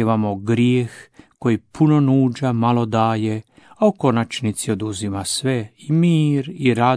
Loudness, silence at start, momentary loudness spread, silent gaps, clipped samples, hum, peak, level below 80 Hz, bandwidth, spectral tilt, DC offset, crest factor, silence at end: -19 LUFS; 0 s; 8 LU; none; under 0.1%; none; -2 dBFS; -58 dBFS; 11 kHz; -6.5 dB/octave; under 0.1%; 16 dB; 0 s